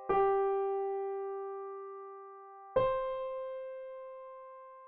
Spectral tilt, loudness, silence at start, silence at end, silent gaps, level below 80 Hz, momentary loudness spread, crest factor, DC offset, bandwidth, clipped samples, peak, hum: -4.5 dB/octave; -35 LUFS; 0 s; 0 s; none; -62 dBFS; 19 LU; 18 dB; under 0.1%; 4 kHz; under 0.1%; -18 dBFS; none